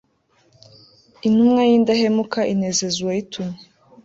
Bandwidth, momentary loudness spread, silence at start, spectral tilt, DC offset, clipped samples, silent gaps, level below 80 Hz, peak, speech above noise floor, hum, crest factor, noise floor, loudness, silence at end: 7.8 kHz; 15 LU; 1.25 s; -4.5 dB/octave; under 0.1%; under 0.1%; none; -60 dBFS; -6 dBFS; 43 dB; none; 14 dB; -61 dBFS; -18 LUFS; 0.5 s